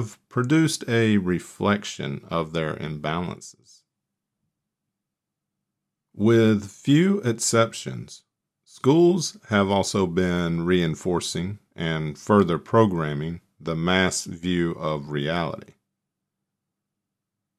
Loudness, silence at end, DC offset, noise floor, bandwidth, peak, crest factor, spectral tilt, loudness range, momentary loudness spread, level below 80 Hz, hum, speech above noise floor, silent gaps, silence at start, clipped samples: -23 LUFS; 2 s; under 0.1%; -85 dBFS; 14 kHz; -4 dBFS; 20 dB; -5.5 dB/octave; 9 LU; 12 LU; -56 dBFS; none; 62 dB; none; 0 s; under 0.1%